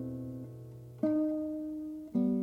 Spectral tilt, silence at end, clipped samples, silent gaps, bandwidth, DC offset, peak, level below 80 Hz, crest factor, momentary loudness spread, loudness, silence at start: -10.5 dB/octave; 0 s; under 0.1%; none; 4.3 kHz; under 0.1%; -18 dBFS; -64 dBFS; 16 dB; 16 LU; -35 LUFS; 0 s